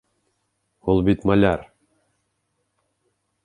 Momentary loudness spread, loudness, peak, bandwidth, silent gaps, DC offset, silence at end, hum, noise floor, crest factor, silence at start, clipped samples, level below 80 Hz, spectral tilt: 11 LU; -20 LUFS; -4 dBFS; 11 kHz; none; under 0.1%; 1.8 s; none; -73 dBFS; 20 dB; 0.85 s; under 0.1%; -44 dBFS; -9 dB/octave